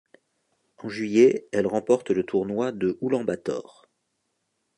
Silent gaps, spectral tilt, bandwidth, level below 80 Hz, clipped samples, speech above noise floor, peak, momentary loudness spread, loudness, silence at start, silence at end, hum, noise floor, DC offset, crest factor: none; -6.5 dB/octave; 10.5 kHz; -64 dBFS; under 0.1%; 52 dB; -6 dBFS; 13 LU; -24 LUFS; 0.8 s; 1.15 s; none; -76 dBFS; under 0.1%; 20 dB